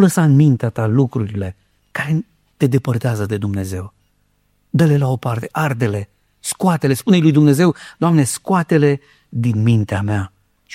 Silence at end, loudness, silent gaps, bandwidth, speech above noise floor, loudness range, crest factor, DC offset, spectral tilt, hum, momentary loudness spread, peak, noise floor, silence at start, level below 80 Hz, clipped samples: 0 s; -17 LUFS; none; 15.5 kHz; 46 dB; 6 LU; 16 dB; under 0.1%; -7 dB/octave; 50 Hz at -40 dBFS; 14 LU; 0 dBFS; -61 dBFS; 0 s; -52 dBFS; under 0.1%